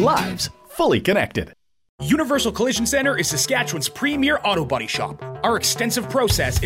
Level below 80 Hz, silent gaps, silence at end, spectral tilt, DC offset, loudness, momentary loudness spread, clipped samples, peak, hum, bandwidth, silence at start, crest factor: -40 dBFS; 1.89-1.98 s; 0 s; -3.5 dB/octave; under 0.1%; -20 LUFS; 7 LU; under 0.1%; -4 dBFS; none; 16 kHz; 0 s; 16 dB